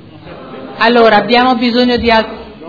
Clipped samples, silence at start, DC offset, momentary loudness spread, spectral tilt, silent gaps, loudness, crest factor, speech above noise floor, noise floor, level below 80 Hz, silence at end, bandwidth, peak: 0.4%; 0.15 s; under 0.1%; 20 LU; -6 dB/octave; none; -10 LUFS; 12 dB; 22 dB; -32 dBFS; -38 dBFS; 0 s; 5.4 kHz; 0 dBFS